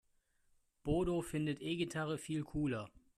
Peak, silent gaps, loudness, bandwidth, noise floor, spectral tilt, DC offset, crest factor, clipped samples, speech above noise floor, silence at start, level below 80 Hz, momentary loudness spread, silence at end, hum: -22 dBFS; none; -39 LUFS; 14 kHz; -75 dBFS; -6 dB/octave; under 0.1%; 18 dB; under 0.1%; 37 dB; 0.85 s; -56 dBFS; 5 LU; 0.3 s; none